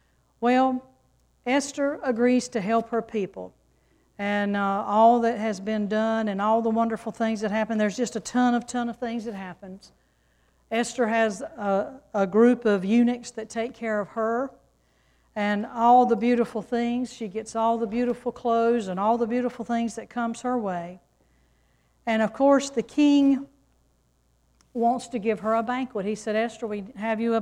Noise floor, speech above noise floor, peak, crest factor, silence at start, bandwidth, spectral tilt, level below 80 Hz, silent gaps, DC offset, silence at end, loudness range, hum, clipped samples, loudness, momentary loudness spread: -66 dBFS; 42 dB; -8 dBFS; 18 dB; 0.4 s; 11 kHz; -5.5 dB/octave; -62 dBFS; none; under 0.1%; 0 s; 5 LU; none; under 0.1%; -25 LUFS; 13 LU